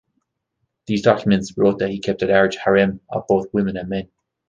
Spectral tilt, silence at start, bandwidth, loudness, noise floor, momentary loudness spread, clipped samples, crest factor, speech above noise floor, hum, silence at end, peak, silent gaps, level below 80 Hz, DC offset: -6.5 dB/octave; 0.9 s; 7.6 kHz; -19 LUFS; -74 dBFS; 9 LU; under 0.1%; 18 dB; 56 dB; none; 0.45 s; -2 dBFS; none; -50 dBFS; under 0.1%